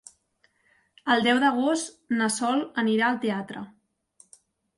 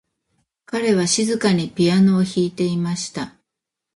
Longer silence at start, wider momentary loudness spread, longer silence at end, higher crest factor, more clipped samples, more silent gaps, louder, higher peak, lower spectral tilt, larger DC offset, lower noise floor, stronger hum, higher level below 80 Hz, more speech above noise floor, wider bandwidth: first, 1.05 s vs 0.7 s; about the same, 14 LU vs 12 LU; first, 1.1 s vs 0.65 s; about the same, 18 dB vs 16 dB; neither; neither; second, -25 LUFS vs -19 LUFS; second, -10 dBFS vs -4 dBFS; second, -3.5 dB/octave vs -5 dB/octave; neither; second, -68 dBFS vs -83 dBFS; neither; second, -72 dBFS vs -58 dBFS; second, 44 dB vs 65 dB; about the same, 11.5 kHz vs 11.5 kHz